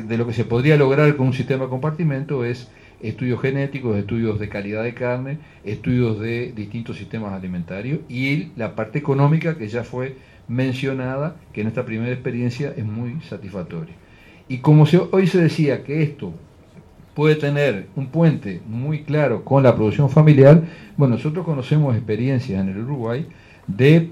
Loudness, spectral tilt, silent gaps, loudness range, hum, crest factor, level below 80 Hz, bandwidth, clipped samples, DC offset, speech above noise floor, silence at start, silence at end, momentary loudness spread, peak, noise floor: -20 LUFS; -8.5 dB/octave; none; 9 LU; none; 18 dB; -52 dBFS; 7.6 kHz; under 0.1%; under 0.1%; 27 dB; 0 s; 0 s; 16 LU; 0 dBFS; -46 dBFS